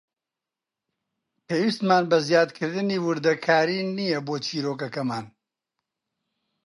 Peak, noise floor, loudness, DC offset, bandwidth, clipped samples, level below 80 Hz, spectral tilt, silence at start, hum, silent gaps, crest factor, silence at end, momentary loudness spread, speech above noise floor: -6 dBFS; -88 dBFS; -24 LUFS; under 0.1%; 11.5 kHz; under 0.1%; -74 dBFS; -5.5 dB/octave; 1.5 s; none; none; 20 dB; 1.35 s; 9 LU; 65 dB